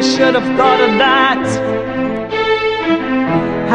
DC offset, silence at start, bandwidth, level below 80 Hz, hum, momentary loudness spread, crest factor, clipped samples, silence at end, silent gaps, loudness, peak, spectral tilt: under 0.1%; 0 s; 10.5 kHz; -46 dBFS; none; 8 LU; 14 dB; under 0.1%; 0 s; none; -13 LUFS; 0 dBFS; -4.5 dB/octave